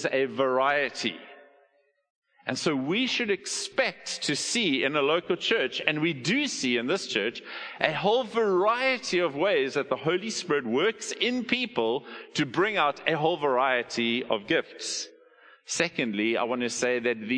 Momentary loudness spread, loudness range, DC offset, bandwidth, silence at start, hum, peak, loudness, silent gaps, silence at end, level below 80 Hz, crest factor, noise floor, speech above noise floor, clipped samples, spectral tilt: 7 LU; 3 LU; under 0.1%; 10.5 kHz; 0 s; none; -4 dBFS; -27 LUFS; 2.10-2.22 s; 0 s; -72 dBFS; 24 dB; -67 dBFS; 40 dB; under 0.1%; -3.5 dB/octave